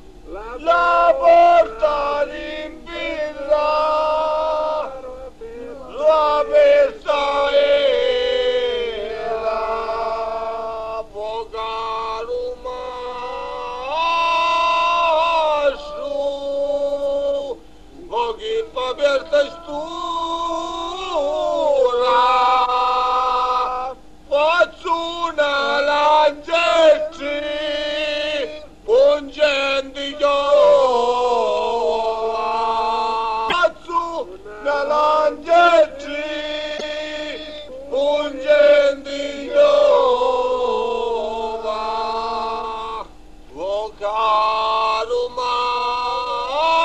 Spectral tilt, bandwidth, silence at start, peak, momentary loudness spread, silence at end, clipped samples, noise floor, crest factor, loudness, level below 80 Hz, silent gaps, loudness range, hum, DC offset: -3 dB/octave; 9.2 kHz; 0.05 s; -2 dBFS; 14 LU; 0 s; under 0.1%; -42 dBFS; 16 dB; -19 LUFS; -46 dBFS; none; 6 LU; none; 0.6%